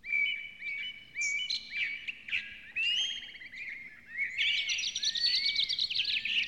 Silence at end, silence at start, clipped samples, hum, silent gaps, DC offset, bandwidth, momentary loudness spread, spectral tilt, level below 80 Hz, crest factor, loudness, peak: 0 s; 0.05 s; under 0.1%; none; none; under 0.1%; 16 kHz; 13 LU; 2.5 dB/octave; -70 dBFS; 16 dB; -31 LUFS; -18 dBFS